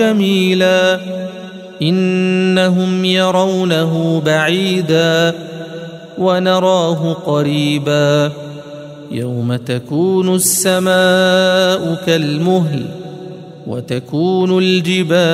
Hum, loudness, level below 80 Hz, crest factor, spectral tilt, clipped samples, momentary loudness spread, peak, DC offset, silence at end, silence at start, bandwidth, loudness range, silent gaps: none; -14 LUFS; -58 dBFS; 14 dB; -5 dB/octave; under 0.1%; 16 LU; 0 dBFS; under 0.1%; 0 s; 0 s; 16 kHz; 3 LU; none